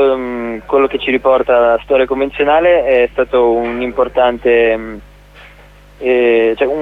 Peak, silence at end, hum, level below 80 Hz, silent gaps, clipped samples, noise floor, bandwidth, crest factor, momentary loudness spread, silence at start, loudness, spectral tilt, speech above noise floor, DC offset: 0 dBFS; 0 s; 50 Hz at -40 dBFS; -40 dBFS; none; under 0.1%; -40 dBFS; 4.7 kHz; 12 dB; 8 LU; 0 s; -13 LUFS; -6.5 dB/octave; 28 dB; under 0.1%